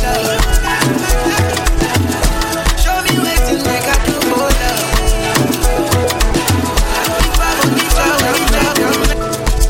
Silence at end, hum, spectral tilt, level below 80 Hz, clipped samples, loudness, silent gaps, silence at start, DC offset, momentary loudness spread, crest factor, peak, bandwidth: 0 s; none; -4 dB/octave; -16 dBFS; under 0.1%; -14 LUFS; none; 0 s; under 0.1%; 3 LU; 12 dB; 0 dBFS; 17 kHz